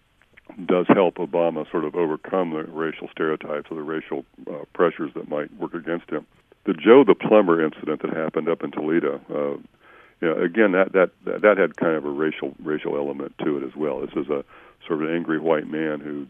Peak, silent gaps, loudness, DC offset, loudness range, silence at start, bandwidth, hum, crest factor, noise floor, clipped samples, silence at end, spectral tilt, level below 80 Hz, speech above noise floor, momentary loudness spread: 0 dBFS; none; -22 LUFS; under 0.1%; 8 LU; 0.55 s; 3.7 kHz; none; 22 dB; -52 dBFS; under 0.1%; 0 s; -9 dB/octave; -66 dBFS; 30 dB; 13 LU